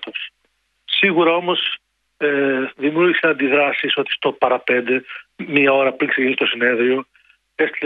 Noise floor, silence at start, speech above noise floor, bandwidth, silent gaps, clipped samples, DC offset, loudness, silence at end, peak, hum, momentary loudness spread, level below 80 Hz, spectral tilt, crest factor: -66 dBFS; 0 s; 49 dB; 4.9 kHz; none; under 0.1%; under 0.1%; -17 LUFS; 0 s; -2 dBFS; none; 10 LU; -68 dBFS; -7 dB/octave; 18 dB